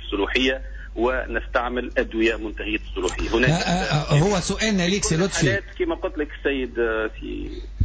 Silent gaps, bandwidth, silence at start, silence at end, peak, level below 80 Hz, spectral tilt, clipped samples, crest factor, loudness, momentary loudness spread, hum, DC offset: none; 8 kHz; 0 s; 0 s; -8 dBFS; -34 dBFS; -4.5 dB/octave; under 0.1%; 14 dB; -23 LUFS; 9 LU; none; under 0.1%